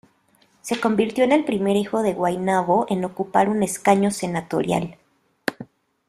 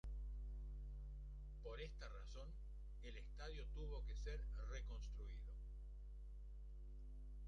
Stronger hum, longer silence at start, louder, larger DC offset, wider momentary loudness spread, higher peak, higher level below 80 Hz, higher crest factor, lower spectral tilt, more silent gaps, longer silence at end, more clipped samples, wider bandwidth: second, none vs 50 Hz at -50 dBFS; first, 0.65 s vs 0.05 s; first, -21 LUFS vs -55 LUFS; neither; first, 11 LU vs 7 LU; first, -2 dBFS vs -38 dBFS; second, -60 dBFS vs -52 dBFS; first, 20 dB vs 12 dB; about the same, -5.5 dB/octave vs -5.5 dB/octave; neither; first, 0.45 s vs 0 s; neither; first, 14 kHz vs 7 kHz